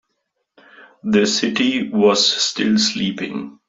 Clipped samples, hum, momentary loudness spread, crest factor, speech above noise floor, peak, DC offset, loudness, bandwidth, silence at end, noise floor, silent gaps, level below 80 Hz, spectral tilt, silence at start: under 0.1%; none; 11 LU; 16 dB; 55 dB; -4 dBFS; under 0.1%; -17 LUFS; 7.8 kHz; 0.15 s; -73 dBFS; none; -60 dBFS; -3.5 dB/octave; 0.8 s